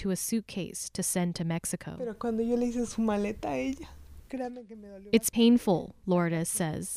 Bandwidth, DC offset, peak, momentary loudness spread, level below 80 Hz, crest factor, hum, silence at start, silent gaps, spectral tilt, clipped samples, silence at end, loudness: 15.5 kHz; under 0.1%; -10 dBFS; 15 LU; -54 dBFS; 20 dB; none; 0 s; none; -5 dB/octave; under 0.1%; 0 s; -30 LUFS